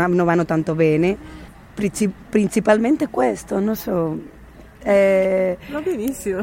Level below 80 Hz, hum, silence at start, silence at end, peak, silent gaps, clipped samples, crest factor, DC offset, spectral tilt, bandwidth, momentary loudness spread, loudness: -46 dBFS; none; 0 s; 0 s; -4 dBFS; none; under 0.1%; 16 dB; under 0.1%; -6.5 dB/octave; 16.5 kHz; 9 LU; -19 LUFS